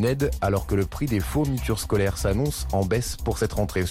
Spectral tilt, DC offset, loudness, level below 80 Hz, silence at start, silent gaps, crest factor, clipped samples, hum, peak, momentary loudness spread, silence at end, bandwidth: -6 dB/octave; under 0.1%; -25 LUFS; -34 dBFS; 0 s; none; 12 dB; under 0.1%; none; -12 dBFS; 3 LU; 0 s; 16.5 kHz